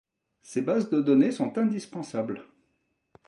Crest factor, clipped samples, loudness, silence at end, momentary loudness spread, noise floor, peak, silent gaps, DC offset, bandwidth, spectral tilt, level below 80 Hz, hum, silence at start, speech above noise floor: 18 dB; under 0.1%; -27 LUFS; 0.85 s; 12 LU; -75 dBFS; -10 dBFS; none; under 0.1%; 11 kHz; -7 dB/octave; -76 dBFS; none; 0.5 s; 49 dB